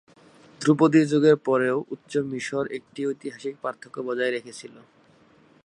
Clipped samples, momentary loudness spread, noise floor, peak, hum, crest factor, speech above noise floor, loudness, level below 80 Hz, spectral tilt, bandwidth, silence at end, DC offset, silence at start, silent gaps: under 0.1%; 15 LU; -57 dBFS; -6 dBFS; none; 20 dB; 33 dB; -24 LUFS; -72 dBFS; -6.5 dB/octave; 10.5 kHz; 0.95 s; under 0.1%; 0.6 s; none